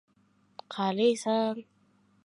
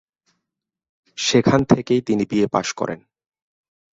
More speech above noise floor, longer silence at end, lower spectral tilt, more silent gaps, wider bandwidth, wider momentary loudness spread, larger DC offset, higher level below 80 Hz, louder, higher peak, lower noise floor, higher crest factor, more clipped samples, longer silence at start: second, 39 dB vs 65 dB; second, 0.65 s vs 1 s; about the same, -5 dB/octave vs -5 dB/octave; neither; first, 11.5 kHz vs 8 kHz; first, 15 LU vs 12 LU; neither; second, -84 dBFS vs -52 dBFS; second, -28 LUFS vs -19 LUFS; second, -14 dBFS vs -2 dBFS; second, -67 dBFS vs -83 dBFS; about the same, 18 dB vs 20 dB; neither; second, 0.7 s vs 1.15 s